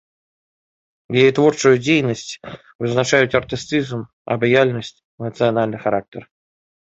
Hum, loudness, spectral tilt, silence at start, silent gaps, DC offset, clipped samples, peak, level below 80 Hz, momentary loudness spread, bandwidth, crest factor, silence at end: none; -18 LUFS; -5 dB/octave; 1.1 s; 2.75-2.79 s, 4.13-4.25 s, 5.04-5.18 s, 6.08-6.12 s; under 0.1%; under 0.1%; -2 dBFS; -54 dBFS; 17 LU; 8 kHz; 18 dB; 0.65 s